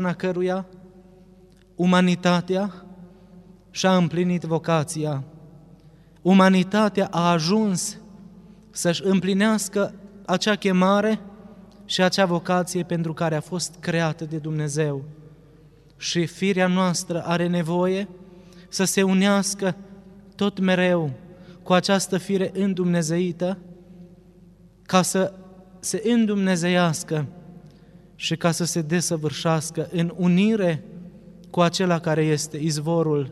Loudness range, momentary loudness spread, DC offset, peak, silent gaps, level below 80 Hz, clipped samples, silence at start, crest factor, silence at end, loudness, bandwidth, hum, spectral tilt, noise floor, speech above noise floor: 4 LU; 11 LU; under 0.1%; -4 dBFS; none; -60 dBFS; under 0.1%; 0 s; 20 dB; 0 s; -22 LUFS; 13.5 kHz; none; -5 dB/octave; -52 dBFS; 30 dB